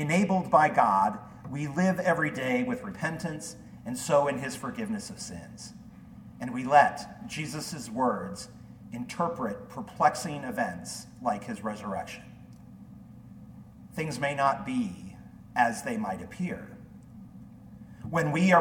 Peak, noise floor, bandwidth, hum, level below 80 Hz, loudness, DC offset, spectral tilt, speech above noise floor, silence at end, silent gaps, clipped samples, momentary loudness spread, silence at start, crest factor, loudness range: -6 dBFS; -49 dBFS; 17.5 kHz; none; -60 dBFS; -29 LUFS; under 0.1%; -5.5 dB/octave; 20 dB; 0 s; none; under 0.1%; 26 LU; 0 s; 24 dB; 6 LU